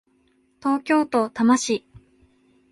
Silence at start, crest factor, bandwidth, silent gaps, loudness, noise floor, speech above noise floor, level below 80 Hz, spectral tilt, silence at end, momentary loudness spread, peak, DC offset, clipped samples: 0.65 s; 18 dB; 11.5 kHz; none; -22 LUFS; -63 dBFS; 43 dB; -64 dBFS; -4 dB/octave; 0.95 s; 8 LU; -6 dBFS; under 0.1%; under 0.1%